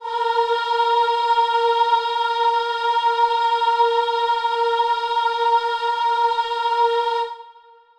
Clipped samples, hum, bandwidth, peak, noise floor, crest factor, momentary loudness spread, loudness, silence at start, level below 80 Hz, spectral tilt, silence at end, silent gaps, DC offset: under 0.1%; none; 9.4 kHz; -6 dBFS; -48 dBFS; 12 dB; 3 LU; -19 LUFS; 0 s; -64 dBFS; 0.5 dB/octave; 0.45 s; none; under 0.1%